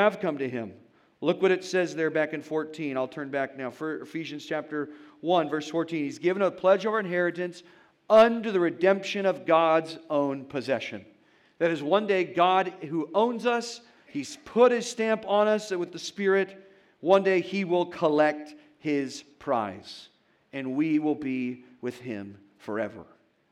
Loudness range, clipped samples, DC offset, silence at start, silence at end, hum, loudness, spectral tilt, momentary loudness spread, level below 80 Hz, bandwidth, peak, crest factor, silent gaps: 7 LU; under 0.1%; under 0.1%; 0 s; 0.5 s; none; -27 LUFS; -5.5 dB/octave; 15 LU; -76 dBFS; 12 kHz; -8 dBFS; 20 dB; none